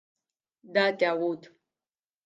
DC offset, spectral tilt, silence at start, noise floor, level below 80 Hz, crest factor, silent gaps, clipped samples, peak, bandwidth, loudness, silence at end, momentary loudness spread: under 0.1%; -5.5 dB/octave; 0.7 s; under -90 dBFS; -86 dBFS; 22 dB; none; under 0.1%; -10 dBFS; 9 kHz; -27 LUFS; 0.9 s; 9 LU